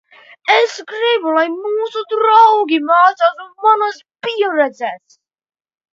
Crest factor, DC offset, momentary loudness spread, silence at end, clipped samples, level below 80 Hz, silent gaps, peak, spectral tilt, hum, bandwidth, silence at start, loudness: 16 dB; under 0.1%; 12 LU; 0.95 s; under 0.1%; -76 dBFS; none; 0 dBFS; -2.5 dB/octave; none; 7.6 kHz; 0.45 s; -14 LUFS